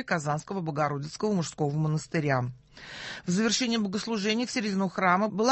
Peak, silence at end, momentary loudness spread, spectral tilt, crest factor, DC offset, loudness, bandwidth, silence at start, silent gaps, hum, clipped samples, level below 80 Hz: -8 dBFS; 0 s; 11 LU; -5 dB/octave; 20 dB; under 0.1%; -28 LUFS; 8.6 kHz; 0 s; none; none; under 0.1%; -64 dBFS